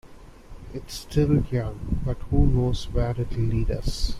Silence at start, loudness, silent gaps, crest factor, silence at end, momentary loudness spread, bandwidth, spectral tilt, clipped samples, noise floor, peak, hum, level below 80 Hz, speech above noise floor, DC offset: 0.05 s; -26 LUFS; none; 18 dB; 0 s; 14 LU; 14 kHz; -7 dB/octave; under 0.1%; -44 dBFS; -6 dBFS; none; -30 dBFS; 21 dB; under 0.1%